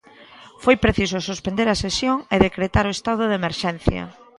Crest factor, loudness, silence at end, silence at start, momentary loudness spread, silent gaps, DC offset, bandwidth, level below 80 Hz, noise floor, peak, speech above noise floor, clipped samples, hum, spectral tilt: 20 dB; -21 LUFS; 0.25 s; 0.2 s; 7 LU; none; under 0.1%; 11.5 kHz; -36 dBFS; -46 dBFS; 0 dBFS; 25 dB; under 0.1%; none; -5 dB/octave